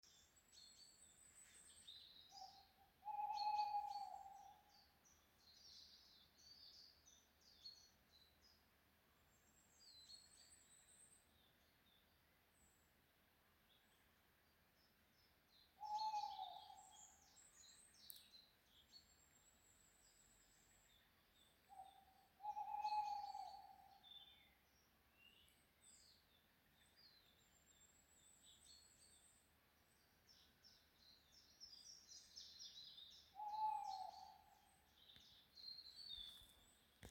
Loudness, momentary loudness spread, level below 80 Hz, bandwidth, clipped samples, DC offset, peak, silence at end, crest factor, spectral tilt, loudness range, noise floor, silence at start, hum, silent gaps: -53 LUFS; 22 LU; -84 dBFS; 16.5 kHz; under 0.1%; under 0.1%; -32 dBFS; 0 s; 26 dB; -1 dB/octave; 17 LU; -78 dBFS; 0.05 s; none; none